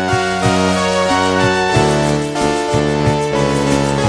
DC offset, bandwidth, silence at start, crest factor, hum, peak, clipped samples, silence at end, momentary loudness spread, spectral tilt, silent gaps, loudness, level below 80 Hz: under 0.1%; 11 kHz; 0 s; 14 dB; none; -2 dBFS; under 0.1%; 0 s; 3 LU; -5 dB/octave; none; -15 LUFS; -34 dBFS